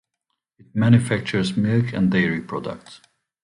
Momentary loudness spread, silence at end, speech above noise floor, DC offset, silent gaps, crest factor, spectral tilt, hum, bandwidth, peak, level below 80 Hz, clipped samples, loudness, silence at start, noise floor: 13 LU; 0.45 s; 58 dB; under 0.1%; none; 18 dB; -7 dB/octave; none; 11.5 kHz; -2 dBFS; -52 dBFS; under 0.1%; -21 LUFS; 0.75 s; -79 dBFS